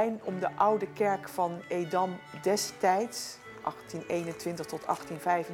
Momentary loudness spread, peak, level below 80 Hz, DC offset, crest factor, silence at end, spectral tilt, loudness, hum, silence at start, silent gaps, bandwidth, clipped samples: 10 LU; -12 dBFS; -72 dBFS; under 0.1%; 20 dB; 0 s; -4.5 dB/octave; -31 LUFS; none; 0 s; none; 18 kHz; under 0.1%